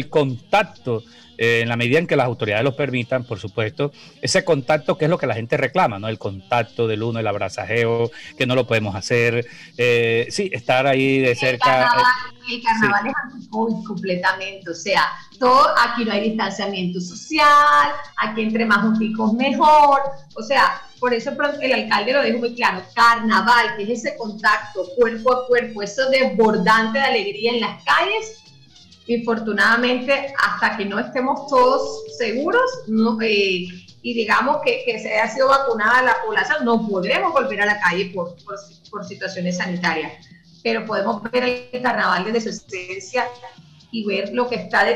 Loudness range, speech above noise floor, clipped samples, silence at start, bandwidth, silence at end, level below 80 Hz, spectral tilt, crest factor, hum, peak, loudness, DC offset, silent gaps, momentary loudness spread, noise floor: 5 LU; 29 dB; under 0.1%; 0 s; 15.5 kHz; 0 s; -58 dBFS; -5 dB/octave; 14 dB; none; -6 dBFS; -19 LUFS; under 0.1%; none; 11 LU; -48 dBFS